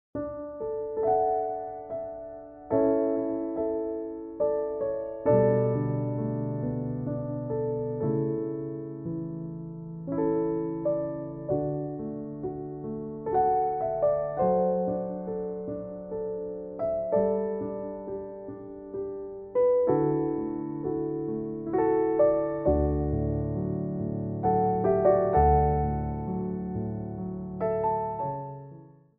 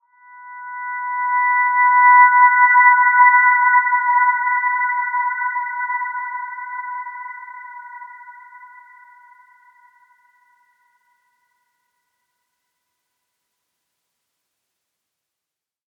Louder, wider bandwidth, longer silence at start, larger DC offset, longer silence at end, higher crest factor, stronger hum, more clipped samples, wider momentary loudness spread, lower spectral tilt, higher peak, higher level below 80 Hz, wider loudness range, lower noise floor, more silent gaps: second, -29 LUFS vs -14 LUFS; first, 2.8 kHz vs 2.2 kHz; second, 0.15 s vs 0.4 s; neither; second, 0.25 s vs 7.3 s; about the same, 18 dB vs 18 dB; neither; neither; second, 13 LU vs 23 LU; first, -12 dB/octave vs -1 dB/octave; second, -10 dBFS vs -2 dBFS; first, -44 dBFS vs -82 dBFS; second, 6 LU vs 21 LU; second, -50 dBFS vs -86 dBFS; neither